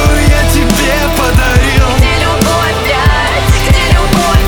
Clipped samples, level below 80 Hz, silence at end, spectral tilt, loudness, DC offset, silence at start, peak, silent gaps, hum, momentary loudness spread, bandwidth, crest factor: under 0.1%; -12 dBFS; 0 s; -4.5 dB/octave; -9 LUFS; under 0.1%; 0 s; 0 dBFS; none; none; 2 LU; over 20 kHz; 8 dB